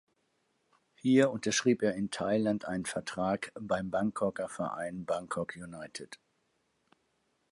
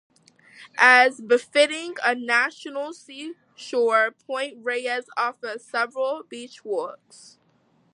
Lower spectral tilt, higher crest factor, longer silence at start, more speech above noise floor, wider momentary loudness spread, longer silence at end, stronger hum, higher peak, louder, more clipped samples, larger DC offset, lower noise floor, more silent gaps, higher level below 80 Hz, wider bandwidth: first, -5 dB/octave vs -1.5 dB/octave; about the same, 20 dB vs 22 dB; first, 1.05 s vs 0.6 s; first, 45 dB vs 40 dB; second, 15 LU vs 20 LU; first, 1.35 s vs 1 s; neither; second, -12 dBFS vs -2 dBFS; second, -32 LUFS vs -22 LUFS; neither; neither; first, -76 dBFS vs -63 dBFS; neither; first, -66 dBFS vs -86 dBFS; about the same, 11.5 kHz vs 11 kHz